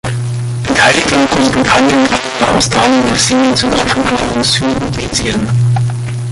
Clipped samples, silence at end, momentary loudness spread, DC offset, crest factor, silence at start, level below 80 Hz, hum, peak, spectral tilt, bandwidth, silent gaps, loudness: under 0.1%; 0 s; 8 LU; under 0.1%; 12 dB; 0.05 s; -32 dBFS; none; 0 dBFS; -4 dB/octave; 11.5 kHz; none; -11 LUFS